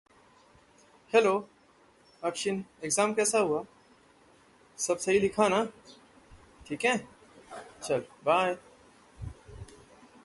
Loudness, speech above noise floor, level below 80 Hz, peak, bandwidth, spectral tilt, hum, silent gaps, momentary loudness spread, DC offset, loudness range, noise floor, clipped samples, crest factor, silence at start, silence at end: -29 LUFS; 33 dB; -60 dBFS; -10 dBFS; 12 kHz; -3.5 dB/octave; none; none; 21 LU; under 0.1%; 3 LU; -62 dBFS; under 0.1%; 22 dB; 1.15 s; 0.6 s